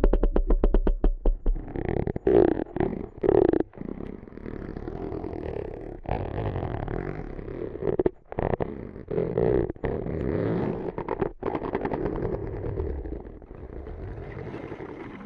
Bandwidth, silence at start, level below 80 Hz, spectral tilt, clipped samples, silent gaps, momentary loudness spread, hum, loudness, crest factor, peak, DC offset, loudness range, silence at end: 4.5 kHz; 0 s; -32 dBFS; -11 dB/octave; under 0.1%; none; 15 LU; none; -29 LUFS; 24 dB; -4 dBFS; under 0.1%; 8 LU; 0 s